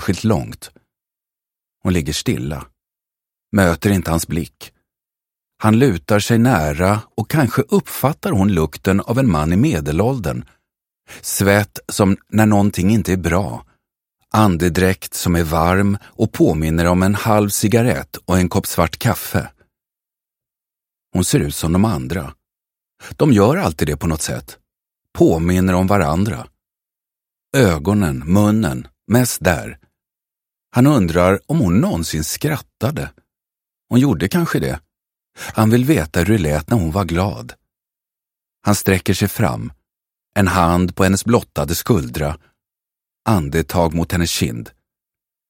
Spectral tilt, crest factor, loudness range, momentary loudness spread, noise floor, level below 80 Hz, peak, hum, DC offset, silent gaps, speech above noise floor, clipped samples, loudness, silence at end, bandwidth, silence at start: -6 dB/octave; 18 dB; 5 LU; 10 LU; -88 dBFS; -36 dBFS; 0 dBFS; none; under 0.1%; none; 72 dB; under 0.1%; -17 LUFS; 0.8 s; 16.5 kHz; 0 s